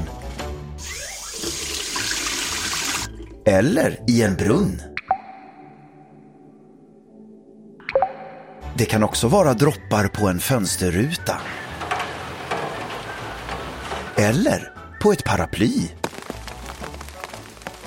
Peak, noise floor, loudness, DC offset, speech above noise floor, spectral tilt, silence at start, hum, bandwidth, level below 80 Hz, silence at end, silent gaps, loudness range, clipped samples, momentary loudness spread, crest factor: -2 dBFS; -48 dBFS; -22 LUFS; under 0.1%; 30 dB; -4.5 dB/octave; 0 s; none; 16.5 kHz; -42 dBFS; 0 s; none; 8 LU; under 0.1%; 16 LU; 22 dB